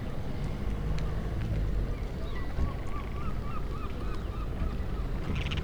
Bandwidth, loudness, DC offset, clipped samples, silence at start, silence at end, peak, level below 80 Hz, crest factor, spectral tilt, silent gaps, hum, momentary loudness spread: 10.5 kHz; -36 LUFS; under 0.1%; under 0.1%; 0 s; 0 s; -16 dBFS; -34 dBFS; 14 dB; -7 dB/octave; none; none; 4 LU